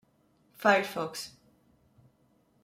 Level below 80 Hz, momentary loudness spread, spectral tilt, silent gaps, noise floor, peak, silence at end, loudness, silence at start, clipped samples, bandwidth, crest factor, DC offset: -76 dBFS; 16 LU; -3.5 dB/octave; none; -68 dBFS; -8 dBFS; 1.35 s; -29 LUFS; 0.6 s; under 0.1%; 16 kHz; 24 dB; under 0.1%